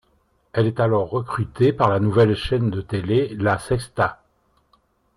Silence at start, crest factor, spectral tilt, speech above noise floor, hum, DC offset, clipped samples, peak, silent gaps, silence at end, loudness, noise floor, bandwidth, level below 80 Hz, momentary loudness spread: 0.55 s; 16 dB; -7.5 dB/octave; 44 dB; none; under 0.1%; under 0.1%; -4 dBFS; none; 1.05 s; -21 LUFS; -64 dBFS; 11.5 kHz; -46 dBFS; 8 LU